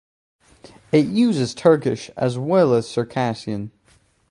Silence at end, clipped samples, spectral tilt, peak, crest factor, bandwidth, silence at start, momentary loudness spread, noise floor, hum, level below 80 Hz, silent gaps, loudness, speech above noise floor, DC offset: 0.6 s; under 0.1%; -6.5 dB/octave; -2 dBFS; 18 dB; 11.5 kHz; 0.95 s; 11 LU; -58 dBFS; none; -58 dBFS; none; -20 LUFS; 39 dB; under 0.1%